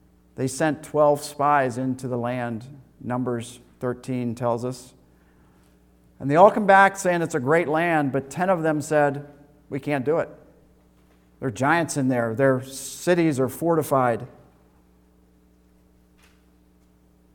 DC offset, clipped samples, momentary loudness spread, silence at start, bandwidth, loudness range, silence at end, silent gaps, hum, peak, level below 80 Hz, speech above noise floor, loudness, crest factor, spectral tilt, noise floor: under 0.1%; under 0.1%; 16 LU; 0.4 s; 19 kHz; 10 LU; 3.05 s; none; none; -2 dBFS; -60 dBFS; 36 dB; -22 LUFS; 22 dB; -6 dB/octave; -58 dBFS